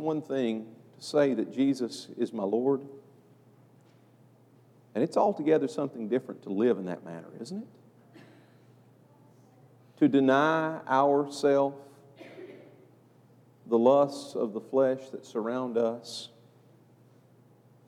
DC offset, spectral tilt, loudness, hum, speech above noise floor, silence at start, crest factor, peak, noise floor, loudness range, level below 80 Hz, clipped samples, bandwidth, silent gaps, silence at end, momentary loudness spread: under 0.1%; -6 dB/octave; -28 LUFS; none; 32 dB; 0 s; 20 dB; -10 dBFS; -59 dBFS; 7 LU; under -90 dBFS; under 0.1%; 12.5 kHz; none; 1.6 s; 19 LU